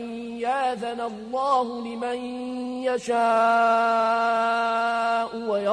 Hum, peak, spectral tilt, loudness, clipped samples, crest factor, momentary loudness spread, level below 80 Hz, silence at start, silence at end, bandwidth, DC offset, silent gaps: none; -10 dBFS; -4 dB/octave; -24 LUFS; under 0.1%; 14 dB; 11 LU; -66 dBFS; 0 s; 0 s; 10.5 kHz; under 0.1%; none